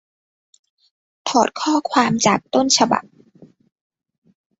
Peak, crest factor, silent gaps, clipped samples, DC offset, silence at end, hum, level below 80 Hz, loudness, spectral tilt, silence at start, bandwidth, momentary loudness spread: -2 dBFS; 20 dB; none; under 0.1%; under 0.1%; 1.6 s; none; -62 dBFS; -18 LUFS; -3 dB/octave; 1.25 s; 8.2 kHz; 5 LU